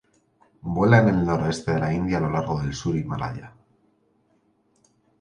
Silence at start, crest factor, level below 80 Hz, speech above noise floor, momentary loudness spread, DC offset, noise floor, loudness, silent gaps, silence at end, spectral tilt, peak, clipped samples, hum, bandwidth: 0.65 s; 22 dB; -46 dBFS; 43 dB; 13 LU; under 0.1%; -65 dBFS; -23 LUFS; none; 1.7 s; -7 dB/octave; -2 dBFS; under 0.1%; none; 10 kHz